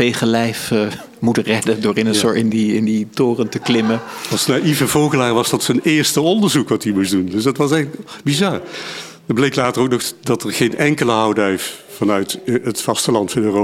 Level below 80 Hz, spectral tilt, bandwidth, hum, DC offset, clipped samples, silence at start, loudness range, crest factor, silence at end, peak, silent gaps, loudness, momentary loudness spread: -54 dBFS; -4.5 dB/octave; 16.5 kHz; none; under 0.1%; under 0.1%; 0 s; 3 LU; 14 dB; 0 s; -2 dBFS; none; -17 LUFS; 7 LU